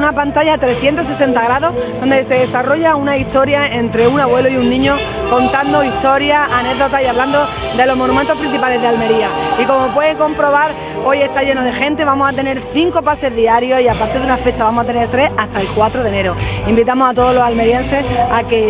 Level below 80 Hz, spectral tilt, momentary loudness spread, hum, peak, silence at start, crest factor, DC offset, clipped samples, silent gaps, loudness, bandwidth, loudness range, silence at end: -32 dBFS; -9.5 dB/octave; 4 LU; none; 0 dBFS; 0 s; 12 dB; under 0.1%; under 0.1%; none; -13 LUFS; 4 kHz; 1 LU; 0 s